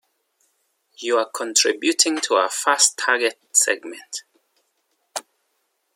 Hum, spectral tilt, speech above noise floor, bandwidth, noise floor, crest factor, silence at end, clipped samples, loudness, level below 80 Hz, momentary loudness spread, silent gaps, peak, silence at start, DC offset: none; 1.5 dB/octave; 51 dB; 16.5 kHz; -71 dBFS; 22 dB; 0.75 s; under 0.1%; -19 LUFS; -82 dBFS; 17 LU; none; -2 dBFS; 1 s; under 0.1%